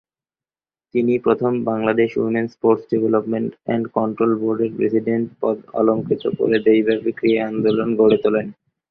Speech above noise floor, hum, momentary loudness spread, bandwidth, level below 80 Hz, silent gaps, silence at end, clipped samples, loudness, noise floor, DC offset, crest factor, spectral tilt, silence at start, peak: over 72 dB; none; 7 LU; 5.4 kHz; -60 dBFS; none; 0.4 s; under 0.1%; -19 LUFS; under -90 dBFS; under 0.1%; 16 dB; -9.5 dB/octave; 0.95 s; -2 dBFS